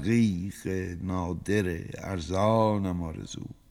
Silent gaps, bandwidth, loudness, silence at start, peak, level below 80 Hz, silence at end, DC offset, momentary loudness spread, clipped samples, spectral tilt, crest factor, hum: none; 15 kHz; -29 LUFS; 0 s; -10 dBFS; -50 dBFS; 0.15 s; under 0.1%; 12 LU; under 0.1%; -7 dB/octave; 18 dB; none